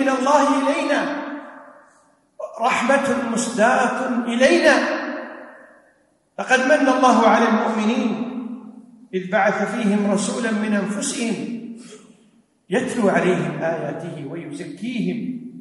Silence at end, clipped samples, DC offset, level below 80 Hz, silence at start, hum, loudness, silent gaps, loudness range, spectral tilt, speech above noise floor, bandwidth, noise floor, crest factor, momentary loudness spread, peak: 0 s; under 0.1%; under 0.1%; -66 dBFS; 0 s; none; -19 LUFS; none; 5 LU; -4.5 dB/octave; 41 dB; 11.5 kHz; -60 dBFS; 18 dB; 17 LU; -4 dBFS